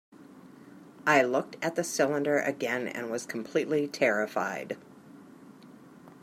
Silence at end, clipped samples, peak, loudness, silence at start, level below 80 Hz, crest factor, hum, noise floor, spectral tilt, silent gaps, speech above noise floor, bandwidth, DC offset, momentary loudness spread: 0.05 s; under 0.1%; -8 dBFS; -29 LUFS; 0.2 s; -80 dBFS; 22 dB; none; -52 dBFS; -4 dB/octave; none; 23 dB; 16 kHz; under 0.1%; 11 LU